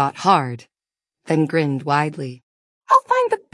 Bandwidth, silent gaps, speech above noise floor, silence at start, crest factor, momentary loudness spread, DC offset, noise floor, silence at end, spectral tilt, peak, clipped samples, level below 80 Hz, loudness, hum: 12 kHz; 2.43-2.81 s; 71 dB; 0 s; 20 dB; 15 LU; under 0.1%; -90 dBFS; 0.15 s; -6 dB/octave; 0 dBFS; under 0.1%; -68 dBFS; -19 LUFS; none